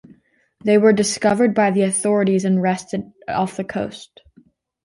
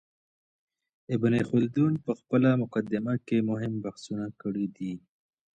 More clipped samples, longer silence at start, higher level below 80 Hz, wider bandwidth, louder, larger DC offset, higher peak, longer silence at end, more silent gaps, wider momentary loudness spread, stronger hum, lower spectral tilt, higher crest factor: neither; second, 0.65 s vs 1.1 s; first, -58 dBFS vs -66 dBFS; first, 11.5 kHz vs 9 kHz; first, -18 LUFS vs -28 LUFS; neither; first, -2 dBFS vs -12 dBFS; first, 0.8 s vs 0.6 s; neither; about the same, 13 LU vs 11 LU; neither; second, -5 dB/octave vs -8.5 dB/octave; about the same, 16 dB vs 16 dB